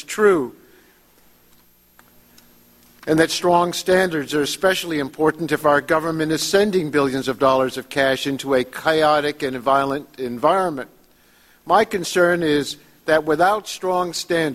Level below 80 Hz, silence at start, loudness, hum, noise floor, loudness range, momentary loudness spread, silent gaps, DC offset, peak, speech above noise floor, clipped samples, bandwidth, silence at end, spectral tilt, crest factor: -54 dBFS; 0 s; -19 LUFS; 60 Hz at -55 dBFS; -54 dBFS; 3 LU; 7 LU; none; under 0.1%; -2 dBFS; 35 dB; under 0.1%; 16 kHz; 0 s; -4 dB/octave; 18 dB